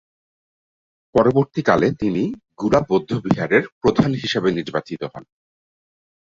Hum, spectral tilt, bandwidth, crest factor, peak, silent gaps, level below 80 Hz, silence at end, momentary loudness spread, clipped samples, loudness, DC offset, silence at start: none; -7 dB/octave; 7.6 kHz; 20 dB; -2 dBFS; 3.72-3.81 s; -50 dBFS; 1.05 s; 9 LU; under 0.1%; -19 LUFS; under 0.1%; 1.15 s